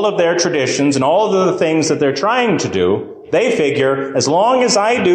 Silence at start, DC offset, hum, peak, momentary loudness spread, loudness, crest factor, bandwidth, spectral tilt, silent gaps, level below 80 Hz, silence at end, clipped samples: 0 s; under 0.1%; none; -4 dBFS; 4 LU; -14 LUFS; 10 dB; 9.8 kHz; -4 dB/octave; none; -52 dBFS; 0 s; under 0.1%